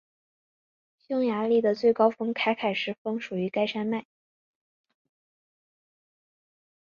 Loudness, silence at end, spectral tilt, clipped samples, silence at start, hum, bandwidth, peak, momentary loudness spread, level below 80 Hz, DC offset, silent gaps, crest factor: -27 LUFS; 2.8 s; -6.5 dB/octave; under 0.1%; 1.1 s; none; 7 kHz; -8 dBFS; 9 LU; -76 dBFS; under 0.1%; 2.98-3.05 s; 20 dB